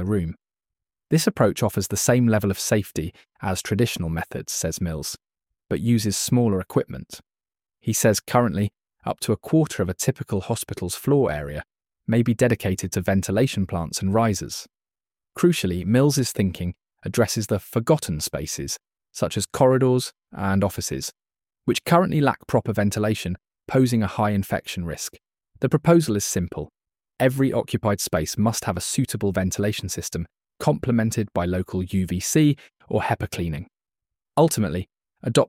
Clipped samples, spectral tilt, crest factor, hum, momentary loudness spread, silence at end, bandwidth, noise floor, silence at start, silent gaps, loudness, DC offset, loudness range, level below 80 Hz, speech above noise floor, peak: under 0.1%; -5.5 dB/octave; 20 dB; none; 13 LU; 0 s; 17 kHz; under -90 dBFS; 0 s; none; -23 LUFS; under 0.1%; 2 LU; -48 dBFS; over 68 dB; -4 dBFS